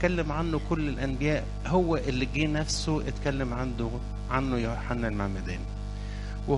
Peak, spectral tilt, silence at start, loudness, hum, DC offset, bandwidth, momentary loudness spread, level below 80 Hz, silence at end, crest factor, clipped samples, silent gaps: -10 dBFS; -6 dB/octave; 0 s; -30 LUFS; 50 Hz at -35 dBFS; under 0.1%; 11.5 kHz; 9 LU; -36 dBFS; 0 s; 18 dB; under 0.1%; none